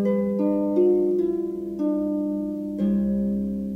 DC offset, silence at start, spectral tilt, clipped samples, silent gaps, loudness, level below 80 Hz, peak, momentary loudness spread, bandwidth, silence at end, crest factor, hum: under 0.1%; 0 s; -10.5 dB/octave; under 0.1%; none; -24 LUFS; -50 dBFS; -10 dBFS; 8 LU; 3.6 kHz; 0 s; 12 dB; none